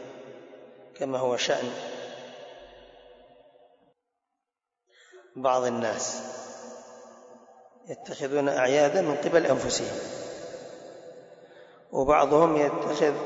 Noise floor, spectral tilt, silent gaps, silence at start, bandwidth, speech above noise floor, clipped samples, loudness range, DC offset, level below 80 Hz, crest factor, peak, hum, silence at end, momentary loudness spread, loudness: -87 dBFS; -4 dB/octave; none; 0 s; 8 kHz; 61 dB; under 0.1%; 8 LU; under 0.1%; -60 dBFS; 20 dB; -8 dBFS; none; 0 s; 24 LU; -26 LUFS